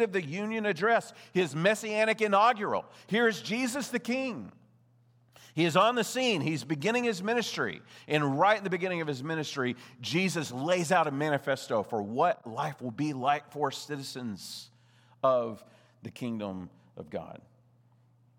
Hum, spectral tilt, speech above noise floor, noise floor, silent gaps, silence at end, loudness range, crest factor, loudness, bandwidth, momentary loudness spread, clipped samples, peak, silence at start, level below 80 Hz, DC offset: none; -4.5 dB/octave; 34 dB; -64 dBFS; none; 1 s; 7 LU; 20 dB; -30 LUFS; 20 kHz; 15 LU; under 0.1%; -10 dBFS; 0 s; -80 dBFS; under 0.1%